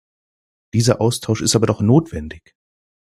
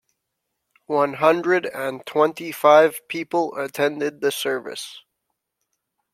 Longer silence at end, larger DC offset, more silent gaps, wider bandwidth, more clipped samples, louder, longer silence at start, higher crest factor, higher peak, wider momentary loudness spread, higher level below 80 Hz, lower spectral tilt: second, 0.8 s vs 1.15 s; neither; neither; second, 14 kHz vs 16 kHz; neither; first, -17 LUFS vs -21 LUFS; second, 0.75 s vs 0.9 s; about the same, 18 dB vs 20 dB; about the same, -2 dBFS vs -2 dBFS; about the same, 14 LU vs 13 LU; first, -46 dBFS vs -72 dBFS; first, -5.5 dB/octave vs -4 dB/octave